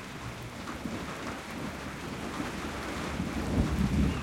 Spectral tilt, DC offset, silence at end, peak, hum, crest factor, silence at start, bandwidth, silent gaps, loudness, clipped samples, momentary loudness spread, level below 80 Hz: -5.5 dB/octave; under 0.1%; 0 s; -12 dBFS; none; 20 dB; 0 s; 16.5 kHz; none; -34 LUFS; under 0.1%; 11 LU; -42 dBFS